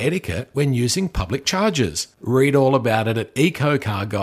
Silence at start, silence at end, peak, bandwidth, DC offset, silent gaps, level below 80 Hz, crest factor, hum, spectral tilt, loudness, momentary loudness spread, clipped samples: 0 s; 0 s; -2 dBFS; 15.5 kHz; under 0.1%; none; -40 dBFS; 16 dB; none; -5 dB/octave; -20 LUFS; 7 LU; under 0.1%